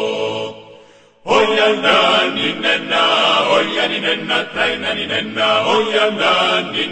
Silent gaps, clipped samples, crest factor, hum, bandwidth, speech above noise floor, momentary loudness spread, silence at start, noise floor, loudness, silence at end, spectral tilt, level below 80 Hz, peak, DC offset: none; under 0.1%; 16 dB; none; 9.2 kHz; 30 dB; 7 LU; 0 s; -45 dBFS; -15 LUFS; 0 s; -3 dB/octave; -56 dBFS; 0 dBFS; under 0.1%